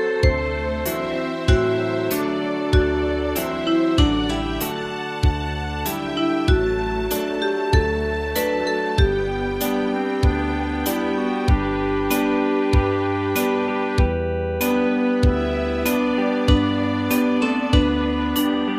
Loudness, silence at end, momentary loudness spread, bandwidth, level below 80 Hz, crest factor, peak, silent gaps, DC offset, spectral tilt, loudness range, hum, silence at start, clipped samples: -21 LUFS; 0 s; 5 LU; 15.5 kHz; -28 dBFS; 16 dB; -4 dBFS; none; under 0.1%; -6 dB/octave; 2 LU; none; 0 s; under 0.1%